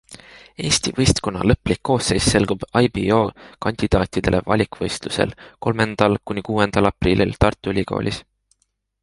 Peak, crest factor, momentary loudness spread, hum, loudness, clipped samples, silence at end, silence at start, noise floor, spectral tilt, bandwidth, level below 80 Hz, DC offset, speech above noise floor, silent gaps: 0 dBFS; 20 dB; 7 LU; none; -20 LUFS; under 0.1%; 0.8 s; 0.1 s; -69 dBFS; -5 dB/octave; 11.5 kHz; -34 dBFS; under 0.1%; 50 dB; none